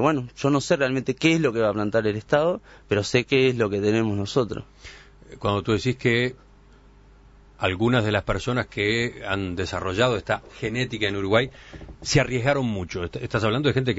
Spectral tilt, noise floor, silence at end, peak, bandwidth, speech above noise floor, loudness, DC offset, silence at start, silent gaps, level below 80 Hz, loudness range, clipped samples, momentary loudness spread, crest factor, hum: -5.5 dB/octave; -51 dBFS; 0 s; -4 dBFS; 8 kHz; 28 dB; -24 LUFS; under 0.1%; 0 s; none; -46 dBFS; 4 LU; under 0.1%; 9 LU; 20 dB; none